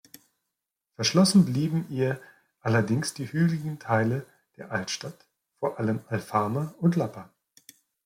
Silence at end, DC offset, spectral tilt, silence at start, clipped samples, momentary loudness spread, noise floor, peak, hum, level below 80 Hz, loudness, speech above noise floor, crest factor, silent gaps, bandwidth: 0.8 s; under 0.1%; -5.5 dB/octave; 1 s; under 0.1%; 12 LU; -85 dBFS; -10 dBFS; none; -66 dBFS; -27 LUFS; 59 dB; 18 dB; none; 16 kHz